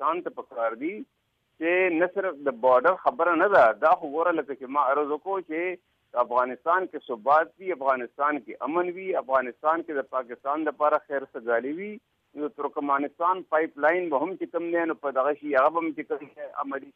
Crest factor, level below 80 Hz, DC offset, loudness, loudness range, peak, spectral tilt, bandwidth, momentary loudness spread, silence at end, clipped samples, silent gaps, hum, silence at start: 16 dB; -76 dBFS; under 0.1%; -26 LUFS; 5 LU; -10 dBFS; -7 dB/octave; 5.6 kHz; 12 LU; 0.05 s; under 0.1%; none; none; 0 s